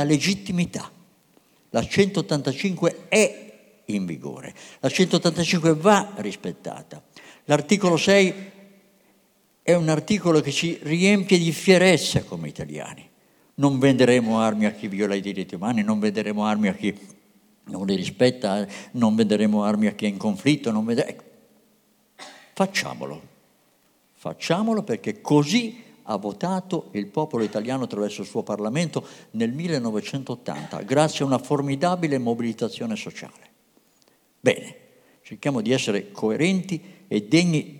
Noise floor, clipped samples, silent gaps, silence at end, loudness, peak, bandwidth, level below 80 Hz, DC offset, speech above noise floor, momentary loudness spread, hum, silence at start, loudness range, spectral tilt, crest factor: -63 dBFS; under 0.1%; none; 0 s; -23 LUFS; -4 dBFS; 17 kHz; -60 dBFS; under 0.1%; 40 dB; 17 LU; none; 0 s; 7 LU; -5 dB/octave; 20 dB